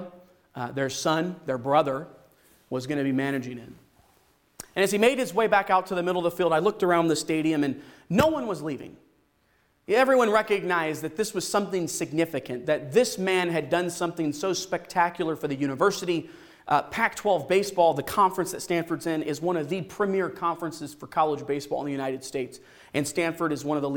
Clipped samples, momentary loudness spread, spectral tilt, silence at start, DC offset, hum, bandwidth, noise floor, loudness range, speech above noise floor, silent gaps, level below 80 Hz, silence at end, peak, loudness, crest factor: under 0.1%; 11 LU; -4.5 dB/octave; 0 s; under 0.1%; none; 18.5 kHz; -67 dBFS; 5 LU; 41 dB; none; -62 dBFS; 0 s; -8 dBFS; -26 LUFS; 18 dB